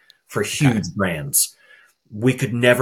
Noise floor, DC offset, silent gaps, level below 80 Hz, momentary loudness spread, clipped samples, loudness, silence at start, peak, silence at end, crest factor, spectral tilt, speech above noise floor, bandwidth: -52 dBFS; under 0.1%; none; -54 dBFS; 7 LU; under 0.1%; -20 LUFS; 0.3 s; -2 dBFS; 0 s; 20 dB; -4 dB/octave; 33 dB; 17.5 kHz